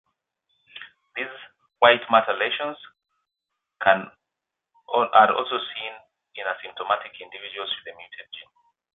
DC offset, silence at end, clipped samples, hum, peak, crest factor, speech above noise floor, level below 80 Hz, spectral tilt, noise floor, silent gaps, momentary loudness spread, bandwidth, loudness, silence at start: under 0.1%; 0.55 s; under 0.1%; none; -2 dBFS; 24 dB; 62 dB; -72 dBFS; -7 dB/octave; -85 dBFS; none; 25 LU; 4.2 kHz; -23 LUFS; 0.75 s